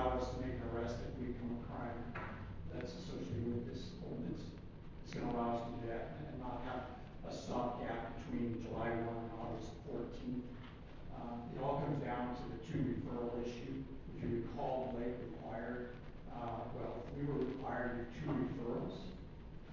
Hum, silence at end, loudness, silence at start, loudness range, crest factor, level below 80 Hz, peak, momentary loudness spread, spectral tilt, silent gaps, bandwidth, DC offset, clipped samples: none; 0 s; -44 LUFS; 0 s; 2 LU; 20 dB; -54 dBFS; -24 dBFS; 10 LU; -7.5 dB/octave; none; 7.6 kHz; under 0.1%; under 0.1%